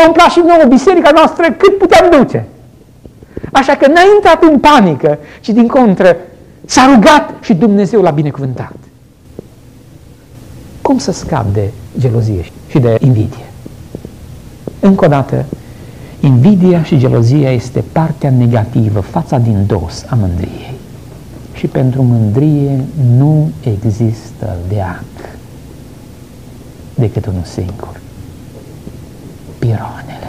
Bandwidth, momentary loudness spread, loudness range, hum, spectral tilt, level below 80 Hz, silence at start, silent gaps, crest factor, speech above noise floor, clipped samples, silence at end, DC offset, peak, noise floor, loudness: 14.5 kHz; 23 LU; 13 LU; none; -7 dB/octave; -36 dBFS; 0 s; none; 10 dB; 30 dB; 0.1%; 0 s; under 0.1%; 0 dBFS; -39 dBFS; -10 LUFS